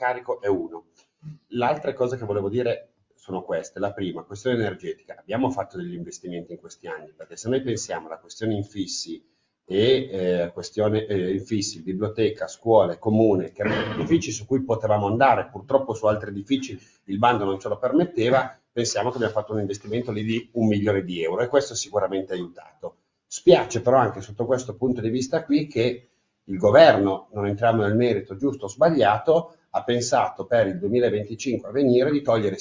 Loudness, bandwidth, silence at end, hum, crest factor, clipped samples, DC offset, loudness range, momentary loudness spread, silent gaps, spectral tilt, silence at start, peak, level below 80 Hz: -23 LUFS; 7.6 kHz; 0 s; none; 22 dB; under 0.1%; under 0.1%; 9 LU; 15 LU; none; -5.5 dB/octave; 0 s; -2 dBFS; -56 dBFS